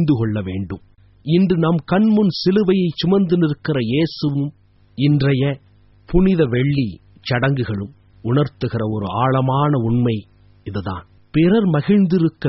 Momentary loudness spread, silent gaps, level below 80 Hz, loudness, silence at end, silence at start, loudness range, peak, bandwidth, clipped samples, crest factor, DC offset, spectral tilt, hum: 13 LU; none; -38 dBFS; -18 LUFS; 0 s; 0 s; 3 LU; -2 dBFS; 6 kHz; under 0.1%; 16 dB; under 0.1%; -7 dB/octave; none